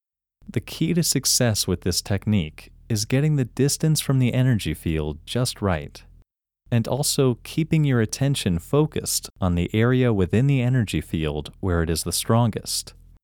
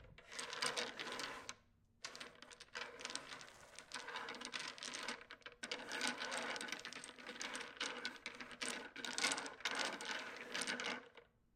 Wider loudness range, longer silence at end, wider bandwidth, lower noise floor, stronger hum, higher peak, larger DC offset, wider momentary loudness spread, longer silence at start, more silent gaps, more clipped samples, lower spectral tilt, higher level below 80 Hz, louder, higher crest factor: second, 2 LU vs 6 LU; about the same, 0.3 s vs 0.3 s; first, 19 kHz vs 16 kHz; second, -58 dBFS vs -72 dBFS; neither; first, -6 dBFS vs -18 dBFS; neither; second, 8 LU vs 13 LU; first, 0.5 s vs 0 s; neither; neither; first, -5 dB/octave vs -0.5 dB/octave; first, -42 dBFS vs -80 dBFS; first, -22 LUFS vs -45 LUFS; second, 16 dB vs 30 dB